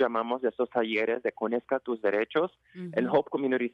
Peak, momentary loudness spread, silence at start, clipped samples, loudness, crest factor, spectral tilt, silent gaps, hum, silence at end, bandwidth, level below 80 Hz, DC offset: -12 dBFS; 5 LU; 0 s; under 0.1%; -29 LUFS; 16 dB; -7.5 dB/octave; none; none; 0.05 s; 6 kHz; -74 dBFS; under 0.1%